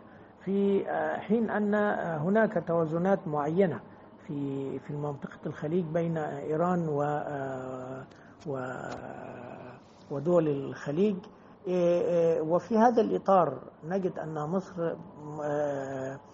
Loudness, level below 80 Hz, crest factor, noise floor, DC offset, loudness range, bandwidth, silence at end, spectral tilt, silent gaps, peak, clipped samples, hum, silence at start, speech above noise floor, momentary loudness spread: -30 LUFS; -70 dBFS; 20 dB; -49 dBFS; under 0.1%; 7 LU; 7.6 kHz; 0 s; -7 dB/octave; none; -10 dBFS; under 0.1%; none; 0 s; 20 dB; 16 LU